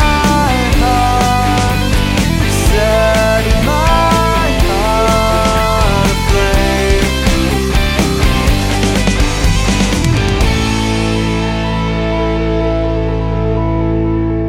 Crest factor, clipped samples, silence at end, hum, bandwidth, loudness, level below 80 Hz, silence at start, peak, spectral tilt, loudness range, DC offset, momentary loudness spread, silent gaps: 12 dB; under 0.1%; 0 s; none; 17 kHz; -13 LUFS; -16 dBFS; 0 s; 0 dBFS; -5 dB/octave; 3 LU; under 0.1%; 4 LU; none